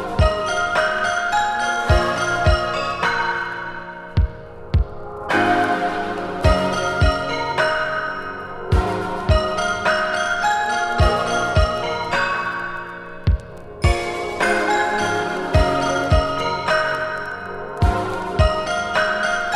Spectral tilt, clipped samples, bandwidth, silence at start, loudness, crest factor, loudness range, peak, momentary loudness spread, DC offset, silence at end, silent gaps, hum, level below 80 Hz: -5 dB/octave; under 0.1%; 13 kHz; 0 s; -20 LUFS; 18 dB; 2 LU; -2 dBFS; 8 LU; under 0.1%; 0 s; none; none; -28 dBFS